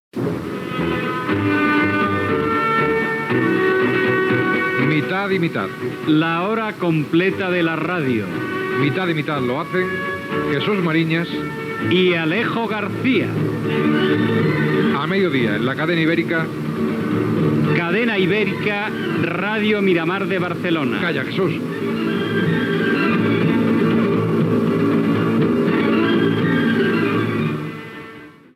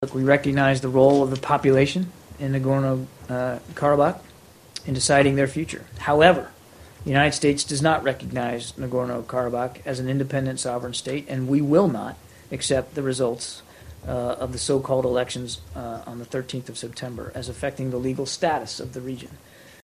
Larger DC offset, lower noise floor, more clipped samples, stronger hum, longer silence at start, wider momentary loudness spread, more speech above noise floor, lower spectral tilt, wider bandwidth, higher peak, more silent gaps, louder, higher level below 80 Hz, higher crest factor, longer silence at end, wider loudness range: neither; about the same, -39 dBFS vs -42 dBFS; neither; neither; first, 0.15 s vs 0 s; second, 6 LU vs 16 LU; about the same, 21 dB vs 19 dB; first, -7.5 dB/octave vs -5 dB/octave; about the same, 15 kHz vs 15 kHz; second, -4 dBFS vs 0 dBFS; neither; first, -19 LUFS vs -23 LUFS; second, -56 dBFS vs -48 dBFS; second, 14 dB vs 24 dB; about the same, 0.25 s vs 0.15 s; second, 2 LU vs 8 LU